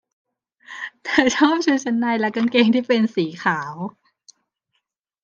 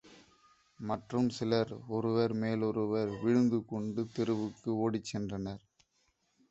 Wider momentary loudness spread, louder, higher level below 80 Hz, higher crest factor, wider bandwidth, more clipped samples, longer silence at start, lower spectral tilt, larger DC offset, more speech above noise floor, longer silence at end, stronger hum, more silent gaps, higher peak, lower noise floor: first, 16 LU vs 9 LU; first, -19 LUFS vs -33 LUFS; about the same, -64 dBFS vs -66 dBFS; about the same, 20 dB vs 18 dB; second, 7.4 kHz vs 8.2 kHz; neither; first, 0.7 s vs 0.05 s; second, -4.5 dB/octave vs -7 dB/octave; neither; first, 56 dB vs 43 dB; first, 1.35 s vs 0.95 s; neither; neither; first, 0 dBFS vs -16 dBFS; about the same, -74 dBFS vs -76 dBFS